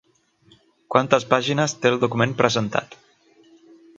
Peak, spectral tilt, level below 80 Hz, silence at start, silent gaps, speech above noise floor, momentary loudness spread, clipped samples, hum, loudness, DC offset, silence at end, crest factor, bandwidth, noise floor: 0 dBFS; -4.5 dB/octave; -62 dBFS; 0.9 s; none; 38 dB; 4 LU; under 0.1%; none; -21 LUFS; under 0.1%; 1.05 s; 22 dB; 8.6 kHz; -58 dBFS